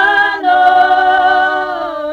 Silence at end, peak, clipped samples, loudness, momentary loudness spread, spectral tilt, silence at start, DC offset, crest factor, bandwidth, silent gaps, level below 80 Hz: 0 s; 0 dBFS; under 0.1%; -11 LUFS; 9 LU; -3.5 dB/octave; 0 s; under 0.1%; 10 dB; 6.8 kHz; none; -48 dBFS